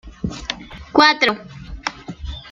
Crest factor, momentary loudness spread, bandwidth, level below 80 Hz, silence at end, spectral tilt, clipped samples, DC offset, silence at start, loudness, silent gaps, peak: 20 dB; 19 LU; 12.5 kHz; -38 dBFS; 0 s; -4 dB/octave; under 0.1%; under 0.1%; 0.05 s; -18 LUFS; none; 0 dBFS